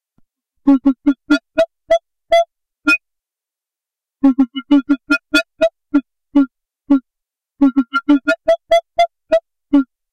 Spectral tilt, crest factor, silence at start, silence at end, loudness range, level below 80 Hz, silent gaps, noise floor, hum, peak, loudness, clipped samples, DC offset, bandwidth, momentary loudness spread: -4 dB/octave; 14 dB; 0.65 s; 0.3 s; 1 LU; -50 dBFS; none; -88 dBFS; none; -2 dBFS; -16 LUFS; under 0.1%; 0.3%; 11 kHz; 5 LU